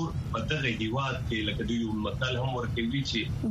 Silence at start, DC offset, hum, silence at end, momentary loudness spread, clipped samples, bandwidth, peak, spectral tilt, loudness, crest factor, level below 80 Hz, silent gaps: 0 s; under 0.1%; none; 0 s; 2 LU; under 0.1%; 13 kHz; -14 dBFS; -6 dB/octave; -30 LUFS; 16 dB; -44 dBFS; none